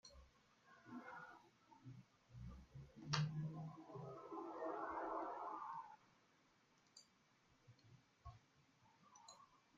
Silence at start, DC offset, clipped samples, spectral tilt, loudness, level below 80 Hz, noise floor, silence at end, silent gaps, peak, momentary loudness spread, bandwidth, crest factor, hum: 0.05 s; under 0.1%; under 0.1%; -5 dB/octave; -50 LUFS; -74 dBFS; -77 dBFS; 0.2 s; none; -22 dBFS; 21 LU; 7.4 kHz; 30 dB; none